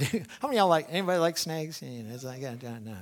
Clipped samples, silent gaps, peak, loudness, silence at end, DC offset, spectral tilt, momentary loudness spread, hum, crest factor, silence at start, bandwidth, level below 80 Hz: under 0.1%; none; -10 dBFS; -29 LUFS; 0 s; under 0.1%; -4.5 dB/octave; 16 LU; none; 20 dB; 0 s; 19.5 kHz; -70 dBFS